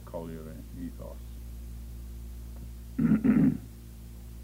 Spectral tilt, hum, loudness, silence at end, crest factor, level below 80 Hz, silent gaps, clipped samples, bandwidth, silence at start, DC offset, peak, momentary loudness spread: -8.5 dB/octave; 60 Hz at -45 dBFS; -29 LUFS; 0 s; 18 dB; -44 dBFS; none; under 0.1%; 16 kHz; 0 s; under 0.1%; -12 dBFS; 22 LU